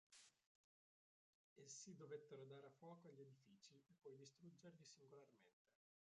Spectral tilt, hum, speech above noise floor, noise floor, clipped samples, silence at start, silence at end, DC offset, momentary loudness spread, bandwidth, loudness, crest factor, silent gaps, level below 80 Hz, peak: -4 dB/octave; none; over 26 dB; under -90 dBFS; under 0.1%; 0.1 s; 0.35 s; under 0.1%; 10 LU; 9.4 kHz; -63 LUFS; 20 dB; 0.46-1.56 s, 5.53-5.65 s; under -90 dBFS; -46 dBFS